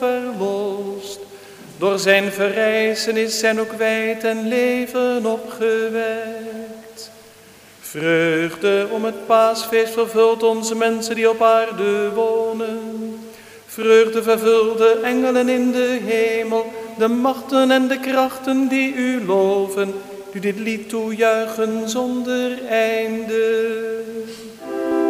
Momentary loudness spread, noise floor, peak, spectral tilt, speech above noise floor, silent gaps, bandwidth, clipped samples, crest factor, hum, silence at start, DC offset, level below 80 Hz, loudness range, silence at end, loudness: 15 LU; -45 dBFS; 0 dBFS; -4 dB/octave; 27 dB; none; 16 kHz; under 0.1%; 18 dB; none; 0 s; under 0.1%; -66 dBFS; 5 LU; 0 s; -19 LUFS